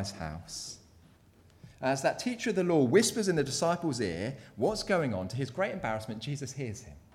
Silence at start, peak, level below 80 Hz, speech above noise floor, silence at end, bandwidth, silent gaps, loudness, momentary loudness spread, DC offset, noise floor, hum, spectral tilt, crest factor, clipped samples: 0 s; -12 dBFS; -58 dBFS; 29 dB; 0.15 s; 16 kHz; none; -31 LUFS; 15 LU; under 0.1%; -60 dBFS; none; -4.5 dB/octave; 20 dB; under 0.1%